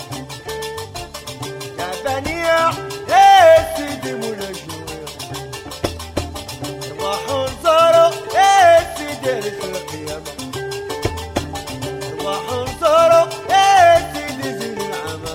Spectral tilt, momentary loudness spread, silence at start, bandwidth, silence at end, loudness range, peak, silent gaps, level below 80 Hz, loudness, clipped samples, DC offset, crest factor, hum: -3.5 dB/octave; 18 LU; 0 s; 16.5 kHz; 0 s; 10 LU; -2 dBFS; none; -42 dBFS; -16 LUFS; under 0.1%; under 0.1%; 14 dB; none